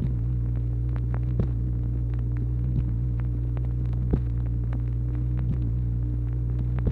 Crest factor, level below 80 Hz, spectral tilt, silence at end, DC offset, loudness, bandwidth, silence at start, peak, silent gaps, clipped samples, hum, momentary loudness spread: 18 dB; -28 dBFS; -11.5 dB/octave; 0 s; under 0.1%; -28 LUFS; 2.8 kHz; 0 s; -8 dBFS; none; under 0.1%; none; 2 LU